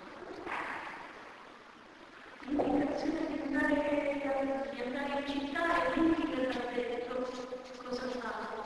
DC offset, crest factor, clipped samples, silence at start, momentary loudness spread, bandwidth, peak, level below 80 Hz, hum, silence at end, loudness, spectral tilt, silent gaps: under 0.1%; 16 dB; under 0.1%; 0 s; 20 LU; 11 kHz; -18 dBFS; -60 dBFS; none; 0 s; -34 LUFS; -5 dB/octave; none